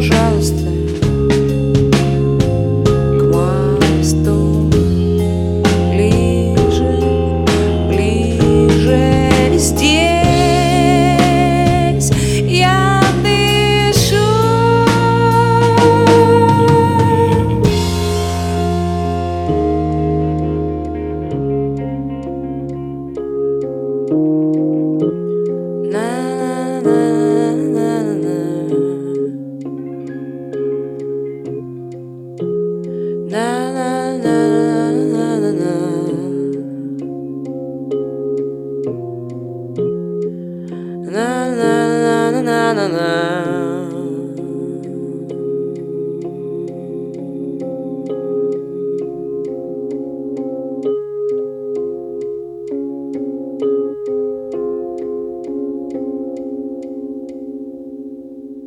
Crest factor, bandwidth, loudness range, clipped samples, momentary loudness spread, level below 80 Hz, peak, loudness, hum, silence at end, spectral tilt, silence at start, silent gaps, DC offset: 16 dB; 16.5 kHz; 12 LU; under 0.1%; 14 LU; -30 dBFS; 0 dBFS; -16 LUFS; none; 0 s; -6 dB/octave; 0 s; none; under 0.1%